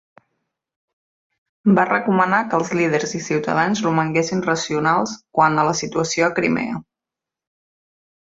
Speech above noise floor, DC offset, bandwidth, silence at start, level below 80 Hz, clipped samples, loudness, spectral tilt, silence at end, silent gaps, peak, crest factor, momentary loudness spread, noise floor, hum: 68 dB; under 0.1%; 8 kHz; 1.65 s; -58 dBFS; under 0.1%; -19 LUFS; -5 dB/octave; 1.5 s; none; -2 dBFS; 18 dB; 6 LU; -87 dBFS; none